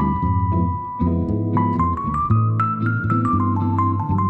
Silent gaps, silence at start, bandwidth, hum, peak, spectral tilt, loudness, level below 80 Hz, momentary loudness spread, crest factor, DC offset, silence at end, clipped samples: none; 0 s; 3.9 kHz; none; -6 dBFS; -11 dB/octave; -20 LUFS; -36 dBFS; 3 LU; 12 dB; under 0.1%; 0 s; under 0.1%